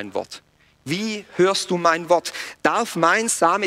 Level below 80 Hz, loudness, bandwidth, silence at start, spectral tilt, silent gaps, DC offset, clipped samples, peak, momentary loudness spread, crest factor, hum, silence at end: -64 dBFS; -21 LUFS; 16 kHz; 0 s; -3 dB/octave; none; under 0.1%; under 0.1%; -2 dBFS; 13 LU; 18 dB; none; 0 s